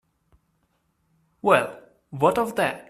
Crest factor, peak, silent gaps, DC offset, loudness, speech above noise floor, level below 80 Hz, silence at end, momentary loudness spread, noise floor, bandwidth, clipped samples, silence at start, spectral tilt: 24 dB; -2 dBFS; none; under 0.1%; -23 LUFS; 48 dB; -62 dBFS; 0.1 s; 12 LU; -70 dBFS; 15 kHz; under 0.1%; 1.45 s; -5 dB/octave